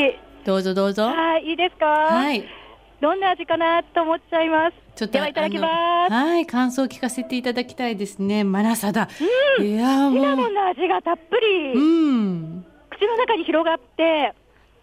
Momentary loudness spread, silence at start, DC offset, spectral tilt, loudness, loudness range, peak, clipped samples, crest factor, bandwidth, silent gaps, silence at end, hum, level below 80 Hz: 8 LU; 0 s; under 0.1%; -5 dB/octave; -21 LUFS; 2 LU; -8 dBFS; under 0.1%; 14 dB; 16 kHz; none; 0.5 s; none; -58 dBFS